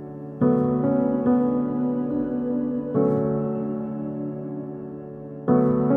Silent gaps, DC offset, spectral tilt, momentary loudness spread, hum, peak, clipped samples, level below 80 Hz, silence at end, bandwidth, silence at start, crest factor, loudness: none; under 0.1%; -12.5 dB/octave; 13 LU; none; -6 dBFS; under 0.1%; -54 dBFS; 0 s; 2.9 kHz; 0 s; 16 dB; -24 LUFS